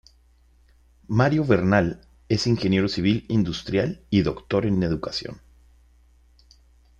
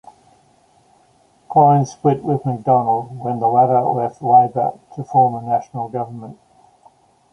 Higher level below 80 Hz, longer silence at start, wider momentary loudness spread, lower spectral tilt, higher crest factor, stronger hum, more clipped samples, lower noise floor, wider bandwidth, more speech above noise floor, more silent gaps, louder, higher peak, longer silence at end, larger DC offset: first, -48 dBFS vs -60 dBFS; second, 1.1 s vs 1.5 s; second, 9 LU vs 13 LU; second, -6.5 dB/octave vs -9 dB/octave; about the same, 20 dB vs 16 dB; neither; neither; about the same, -57 dBFS vs -55 dBFS; first, 9 kHz vs 6.8 kHz; second, 35 dB vs 39 dB; neither; second, -23 LUFS vs -17 LUFS; about the same, -4 dBFS vs -2 dBFS; first, 1.6 s vs 1 s; neither